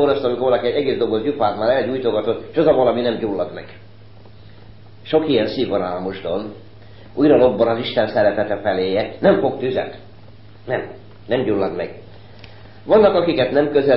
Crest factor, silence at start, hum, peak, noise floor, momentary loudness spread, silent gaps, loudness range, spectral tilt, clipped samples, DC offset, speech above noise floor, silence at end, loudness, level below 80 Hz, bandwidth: 16 dB; 0 s; none; -2 dBFS; -44 dBFS; 12 LU; none; 6 LU; -11 dB/octave; under 0.1%; 0.7%; 26 dB; 0 s; -18 LUFS; -50 dBFS; 5.8 kHz